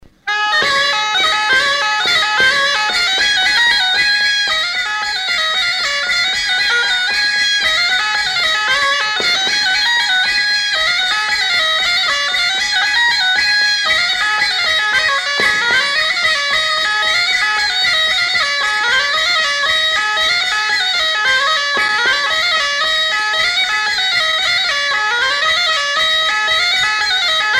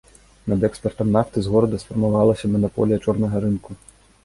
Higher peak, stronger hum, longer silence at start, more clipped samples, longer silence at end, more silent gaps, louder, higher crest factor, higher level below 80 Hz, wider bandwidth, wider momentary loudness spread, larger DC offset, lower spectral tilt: about the same, -2 dBFS vs -4 dBFS; neither; second, 0.25 s vs 0.45 s; neither; second, 0 s vs 0.5 s; neither; first, -13 LUFS vs -21 LUFS; second, 12 dB vs 18 dB; about the same, -48 dBFS vs -44 dBFS; first, 16 kHz vs 11.5 kHz; second, 2 LU vs 7 LU; neither; second, 1 dB/octave vs -8.5 dB/octave